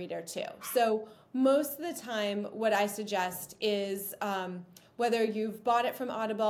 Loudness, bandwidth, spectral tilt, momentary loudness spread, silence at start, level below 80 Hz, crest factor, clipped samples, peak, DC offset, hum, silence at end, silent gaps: -32 LUFS; 18 kHz; -4 dB/octave; 9 LU; 0 s; -78 dBFS; 16 dB; under 0.1%; -16 dBFS; under 0.1%; none; 0 s; none